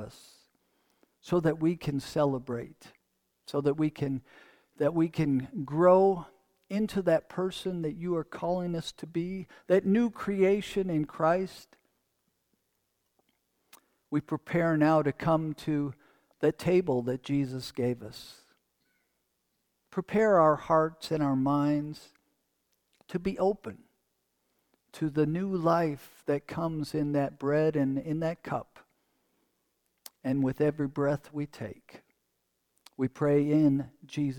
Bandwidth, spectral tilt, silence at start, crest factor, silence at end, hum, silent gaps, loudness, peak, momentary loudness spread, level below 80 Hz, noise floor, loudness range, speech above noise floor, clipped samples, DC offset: 18 kHz; -7.5 dB/octave; 0 s; 20 dB; 0 s; none; none; -29 LUFS; -10 dBFS; 13 LU; -60 dBFS; -79 dBFS; 6 LU; 50 dB; under 0.1%; under 0.1%